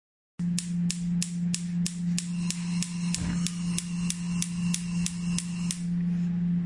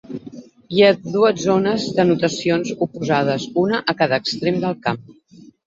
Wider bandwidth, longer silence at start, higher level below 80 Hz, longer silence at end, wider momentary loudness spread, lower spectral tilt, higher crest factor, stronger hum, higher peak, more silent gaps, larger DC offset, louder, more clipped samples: first, 11.5 kHz vs 7.8 kHz; first, 0.4 s vs 0.1 s; first, -52 dBFS vs -58 dBFS; second, 0 s vs 0.55 s; second, 2 LU vs 9 LU; about the same, -4.5 dB/octave vs -5.5 dB/octave; first, 24 dB vs 18 dB; neither; second, -6 dBFS vs -2 dBFS; neither; neither; second, -30 LUFS vs -19 LUFS; neither